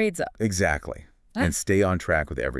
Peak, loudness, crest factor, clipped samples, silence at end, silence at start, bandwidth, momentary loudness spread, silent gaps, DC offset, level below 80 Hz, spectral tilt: -8 dBFS; -24 LUFS; 18 dB; under 0.1%; 0 s; 0 s; 12 kHz; 14 LU; none; under 0.1%; -42 dBFS; -5 dB/octave